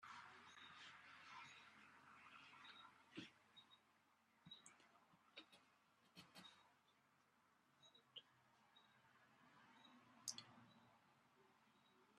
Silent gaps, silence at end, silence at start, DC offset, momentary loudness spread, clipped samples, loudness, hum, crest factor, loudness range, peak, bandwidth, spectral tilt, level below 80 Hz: none; 0 s; 0 s; under 0.1%; 13 LU; under 0.1%; -62 LUFS; none; 34 dB; 7 LU; -32 dBFS; 11 kHz; -1.5 dB/octave; under -90 dBFS